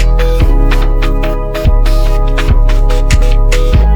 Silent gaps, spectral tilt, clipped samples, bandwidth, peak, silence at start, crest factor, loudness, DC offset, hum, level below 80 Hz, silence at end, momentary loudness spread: none; -6 dB/octave; under 0.1%; 10.5 kHz; 0 dBFS; 0 s; 8 dB; -13 LUFS; under 0.1%; none; -8 dBFS; 0 s; 3 LU